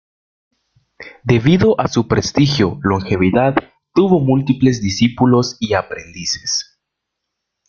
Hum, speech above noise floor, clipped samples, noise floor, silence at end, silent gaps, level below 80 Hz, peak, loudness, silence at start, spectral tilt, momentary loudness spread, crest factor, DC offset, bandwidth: none; 63 dB; under 0.1%; -78 dBFS; 1.05 s; none; -44 dBFS; 0 dBFS; -15 LUFS; 1 s; -5.5 dB/octave; 8 LU; 16 dB; under 0.1%; 7.2 kHz